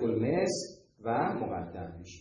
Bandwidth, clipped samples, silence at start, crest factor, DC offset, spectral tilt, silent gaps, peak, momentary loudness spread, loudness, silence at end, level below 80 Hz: 10 kHz; under 0.1%; 0 s; 16 dB; under 0.1%; -5.5 dB/octave; none; -16 dBFS; 14 LU; -32 LUFS; 0 s; -62 dBFS